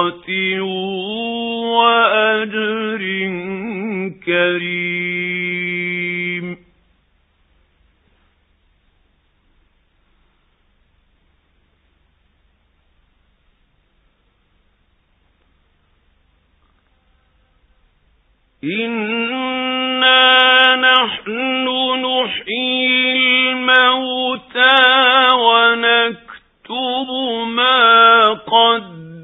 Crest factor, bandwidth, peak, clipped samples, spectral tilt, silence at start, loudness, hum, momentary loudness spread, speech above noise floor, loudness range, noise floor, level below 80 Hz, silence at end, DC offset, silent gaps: 18 dB; 4 kHz; 0 dBFS; under 0.1%; -6.5 dB/octave; 0 s; -14 LUFS; none; 13 LU; 41 dB; 13 LU; -60 dBFS; -62 dBFS; 0 s; under 0.1%; none